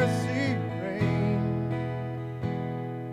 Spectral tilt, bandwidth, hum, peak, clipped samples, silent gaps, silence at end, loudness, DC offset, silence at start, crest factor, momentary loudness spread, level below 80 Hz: -7.5 dB/octave; 11.5 kHz; none; -12 dBFS; under 0.1%; none; 0 s; -30 LUFS; under 0.1%; 0 s; 16 dB; 7 LU; -56 dBFS